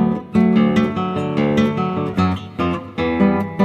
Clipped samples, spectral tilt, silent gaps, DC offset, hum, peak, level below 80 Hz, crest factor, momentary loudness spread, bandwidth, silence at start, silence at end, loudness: under 0.1%; -8 dB/octave; none; under 0.1%; none; -2 dBFS; -44 dBFS; 14 dB; 7 LU; 8.2 kHz; 0 s; 0 s; -18 LUFS